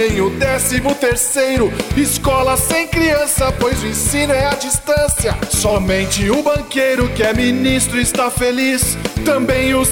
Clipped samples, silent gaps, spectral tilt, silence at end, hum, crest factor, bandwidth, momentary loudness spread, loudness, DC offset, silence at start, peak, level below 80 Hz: under 0.1%; none; -3.5 dB/octave; 0 s; none; 14 dB; 19.5 kHz; 3 LU; -15 LUFS; 0.3%; 0 s; 0 dBFS; -28 dBFS